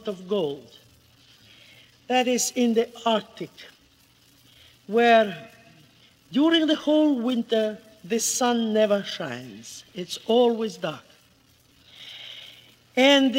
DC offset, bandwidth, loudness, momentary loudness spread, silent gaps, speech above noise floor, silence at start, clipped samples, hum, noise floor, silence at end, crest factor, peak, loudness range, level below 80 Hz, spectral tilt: under 0.1%; 16 kHz; -23 LUFS; 20 LU; none; 36 dB; 0.05 s; under 0.1%; none; -59 dBFS; 0 s; 20 dB; -4 dBFS; 5 LU; -72 dBFS; -3 dB/octave